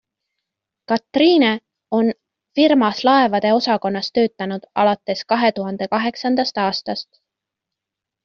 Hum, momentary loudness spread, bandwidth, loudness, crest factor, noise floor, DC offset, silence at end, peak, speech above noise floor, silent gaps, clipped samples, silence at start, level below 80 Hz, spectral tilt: none; 11 LU; 6.8 kHz; -18 LUFS; 16 dB; -84 dBFS; under 0.1%; 1.2 s; -4 dBFS; 67 dB; none; under 0.1%; 0.9 s; -62 dBFS; -3 dB/octave